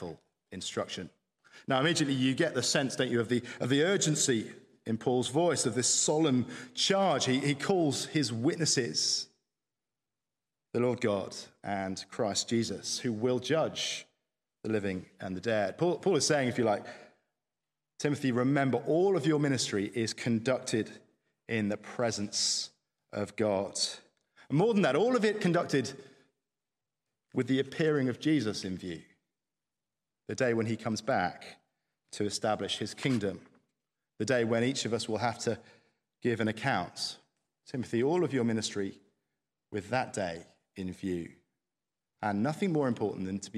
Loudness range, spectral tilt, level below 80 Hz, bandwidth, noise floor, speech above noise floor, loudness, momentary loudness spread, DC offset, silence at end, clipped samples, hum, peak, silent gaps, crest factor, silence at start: 6 LU; -4 dB/octave; -74 dBFS; 14 kHz; under -90 dBFS; over 60 dB; -31 LUFS; 13 LU; under 0.1%; 0 s; under 0.1%; none; -12 dBFS; none; 20 dB; 0 s